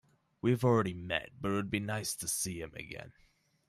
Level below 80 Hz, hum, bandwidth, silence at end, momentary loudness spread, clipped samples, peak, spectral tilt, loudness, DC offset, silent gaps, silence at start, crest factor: -62 dBFS; none; 15 kHz; 0.6 s; 14 LU; under 0.1%; -16 dBFS; -4.5 dB/octave; -34 LUFS; under 0.1%; none; 0.45 s; 18 dB